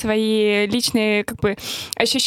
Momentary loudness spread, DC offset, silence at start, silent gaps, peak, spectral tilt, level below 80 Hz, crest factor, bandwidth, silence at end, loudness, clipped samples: 6 LU; under 0.1%; 0 s; none; -2 dBFS; -3.5 dB/octave; -50 dBFS; 18 dB; 16.5 kHz; 0 s; -19 LUFS; under 0.1%